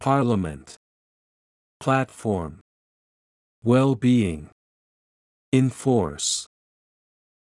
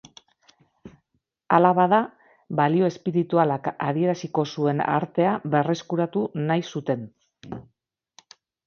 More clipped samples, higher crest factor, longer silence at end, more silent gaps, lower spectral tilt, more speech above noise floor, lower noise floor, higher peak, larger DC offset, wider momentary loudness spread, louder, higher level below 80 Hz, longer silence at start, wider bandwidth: neither; about the same, 18 dB vs 22 dB; about the same, 1 s vs 1.05 s; first, 0.77-1.80 s, 2.61-3.62 s, 4.52-5.52 s vs none; second, -5.5 dB/octave vs -7.5 dB/octave; first, over 68 dB vs 53 dB; first, under -90 dBFS vs -75 dBFS; second, -6 dBFS vs -2 dBFS; neither; about the same, 13 LU vs 11 LU; about the same, -23 LUFS vs -23 LUFS; first, -54 dBFS vs -66 dBFS; second, 0 s vs 0.85 s; first, 12 kHz vs 7 kHz